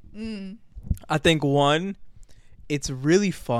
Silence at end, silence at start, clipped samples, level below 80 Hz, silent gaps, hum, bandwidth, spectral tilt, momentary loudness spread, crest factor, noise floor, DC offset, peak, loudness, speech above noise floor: 0 s; 0.05 s; under 0.1%; -42 dBFS; none; none; 15.5 kHz; -5 dB/octave; 18 LU; 18 dB; -45 dBFS; under 0.1%; -6 dBFS; -23 LUFS; 22 dB